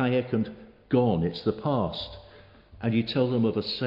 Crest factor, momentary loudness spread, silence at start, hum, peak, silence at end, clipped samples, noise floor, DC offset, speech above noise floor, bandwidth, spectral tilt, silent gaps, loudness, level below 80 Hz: 16 dB; 11 LU; 0 s; none; -10 dBFS; 0 s; under 0.1%; -51 dBFS; under 0.1%; 25 dB; 5.6 kHz; -9 dB/octave; none; -27 LUFS; -56 dBFS